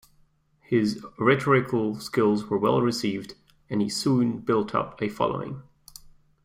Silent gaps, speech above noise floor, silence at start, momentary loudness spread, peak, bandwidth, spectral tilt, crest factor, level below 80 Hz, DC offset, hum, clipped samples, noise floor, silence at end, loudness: none; 38 dB; 0.7 s; 10 LU; -6 dBFS; 16 kHz; -6 dB/octave; 20 dB; -60 dBFS; under 0.1%; none; under 0.1%; -62 dBFS; 0.4 s; -25 LUFS